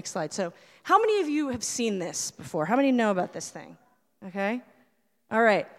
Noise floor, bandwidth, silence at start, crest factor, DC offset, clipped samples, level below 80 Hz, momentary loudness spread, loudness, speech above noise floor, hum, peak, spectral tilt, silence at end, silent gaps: -68 dBFS; 15.5 kHz; 0.05 s; 20 dB; under 0.1%; under 0.1%; -70 dBFS; 16 LU; -27 LUFS; 41 dB; none; -8 dBFS; -4 dB/octave; 0.1 s; none